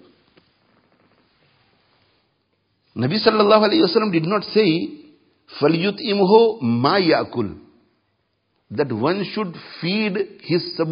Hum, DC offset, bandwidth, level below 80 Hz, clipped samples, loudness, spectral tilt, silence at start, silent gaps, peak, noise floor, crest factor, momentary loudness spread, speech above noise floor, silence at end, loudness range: none; under 0.1%; 5.4 kHz; -60 dBFS; under 0.1%; -19 LUFS; -10.5 dB/octave; 2.95 s; none; 0 dBFS; -69 dBFS; 20 dB; 13 LU; 51 dB; 0 s; 7 LU